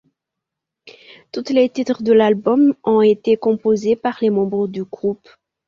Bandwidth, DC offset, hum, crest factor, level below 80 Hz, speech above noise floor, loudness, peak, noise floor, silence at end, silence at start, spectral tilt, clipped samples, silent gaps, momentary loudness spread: 7.2 kHz; under 0.1%; none; 16 dB; -60 dBFS; 66 dB; -17 LUFS; -2 dBFS; -82 dBFS; 0.55 s; 0.85 s; -7 dB/octave; under 0.1%; none; 10 LU